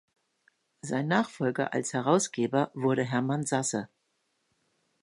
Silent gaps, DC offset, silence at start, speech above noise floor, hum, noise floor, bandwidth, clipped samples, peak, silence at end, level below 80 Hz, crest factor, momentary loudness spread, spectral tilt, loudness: none; under 0.1%; 0.85 s; 48 dB; none; -76 dBFS; 11.5 kHz; under 0.1%; -10 dBFS; 1.15 s; -74 dBFS; 20 dB; 7 LU; -5 dB/octave; -29 LUFS